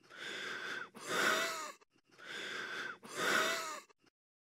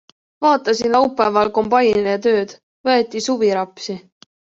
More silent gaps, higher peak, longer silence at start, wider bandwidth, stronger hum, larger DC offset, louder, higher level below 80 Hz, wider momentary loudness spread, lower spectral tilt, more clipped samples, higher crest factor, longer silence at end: second, none vs 2.63-2.84 s; second, -18 dBFS vs -2 dBFS; second, 0.1 s vs 0.4 s; first, 16 kHz vs 7.8 kHz; neither; neither; second, -37 LUFS vs -17 LUFS; second, under -90 dBFS vs -58 dBFS; about the same, 14 LU vs 12 LU; second, -1 dB/octave vs -4.5 dB/octave; neither; first, 22 dB vs 16 dB; about the same, 0.65 s vs 0.6 s